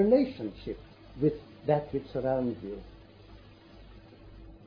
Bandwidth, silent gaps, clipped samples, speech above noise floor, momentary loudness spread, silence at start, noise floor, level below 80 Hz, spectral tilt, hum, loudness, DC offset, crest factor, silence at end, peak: 5.2 kHz; none; under 0.1%; 23 dB; 24 LU; 0 s; -52 dBFS; -54 dBFS; -10 dB/octave; none; -31 LUFS; under 0.1%; 20 dB; 0.1 s; -12 dBFS